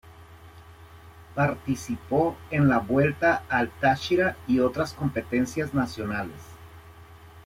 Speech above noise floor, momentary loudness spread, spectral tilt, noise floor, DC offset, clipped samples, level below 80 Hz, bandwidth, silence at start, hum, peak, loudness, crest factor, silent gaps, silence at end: 23 dB; 9 LU; -6.5 dB/octave; -48 dBFS; under 0.1%; under 0.1%; -52 dBFS; 16 kHz; 0.05 s; none; -10 dBFS; -25 LUFS; 18 dB; none; 0.05 s